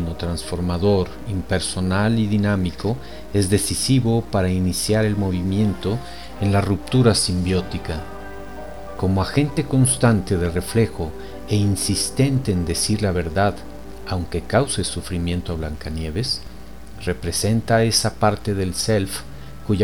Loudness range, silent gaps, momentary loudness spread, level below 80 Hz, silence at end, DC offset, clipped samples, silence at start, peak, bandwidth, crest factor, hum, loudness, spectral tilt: 4 LU; none; 13 LU; -38 dBFS; 0 s; 2%; under 0.1%; 0 s; -4 dBFS; 17.5 kHz; 18 dB; none; -21 LUFS; -5 dB/octave